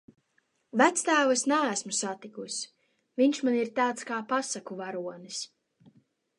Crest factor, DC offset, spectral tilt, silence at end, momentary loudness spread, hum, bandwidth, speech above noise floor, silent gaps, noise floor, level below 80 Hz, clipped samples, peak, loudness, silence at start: 22 dB; under 0.1%; -2.5 dB/octave; 0.95 s; 14 LU; none; 11.5 kHz; 45 dB; none; -73 dBFS; -84 dBFS; under 0.1%; -8 dBFS; -28 LUFS; 0.75 s